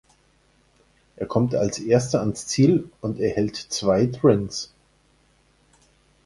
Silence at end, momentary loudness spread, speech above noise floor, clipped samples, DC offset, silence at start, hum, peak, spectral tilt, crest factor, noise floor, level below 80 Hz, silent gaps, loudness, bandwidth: 1.6 s; 12 LU; 40 dB; under 0.1%; under 0.1%; 1.2 s; 60 Hz at -45 dBFS; -4 dBFS; -6 dB/octave; 20 dB; -61 dBFS; -52 dBFS; none; -22 LUFS; 11.5 kHz